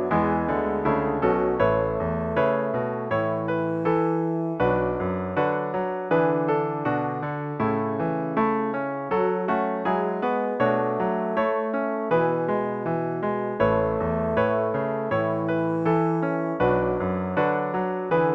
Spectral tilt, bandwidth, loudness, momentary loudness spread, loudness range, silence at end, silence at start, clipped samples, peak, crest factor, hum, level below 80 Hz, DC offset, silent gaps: -9.5 dB/octave; 5.8 kHz; -24 LUFS; 4 LU; 1 LU; 0 s; 0 s; under 0.1%; -8 dBFS; 16 dB; none; -50 dBFS; under 0.1%; none